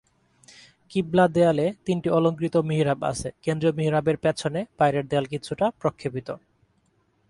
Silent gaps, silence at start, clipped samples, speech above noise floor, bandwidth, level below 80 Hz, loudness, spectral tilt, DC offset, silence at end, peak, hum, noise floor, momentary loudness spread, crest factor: none; 0.9 s; under 0.1%; 43 dB; 11.5 kHz; -56 dBFS; -24 LUFS; -6.5 dB/octave; under 0.1%; 0.9 s; -6 dBFS; none; -67 dBFS; 10 LU; 18 dB